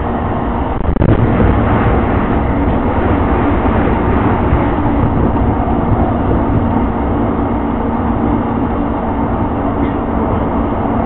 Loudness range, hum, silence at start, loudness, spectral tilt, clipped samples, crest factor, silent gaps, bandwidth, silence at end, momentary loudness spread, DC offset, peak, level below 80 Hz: 3 LU; none; 0 s; -14 LUFS; -14 dB/octave; under 0.1%; 12 dB; none; 4.1 kHz; 0 s; 4 LU; under 0.1%; 0 dBFS; -20 dBFS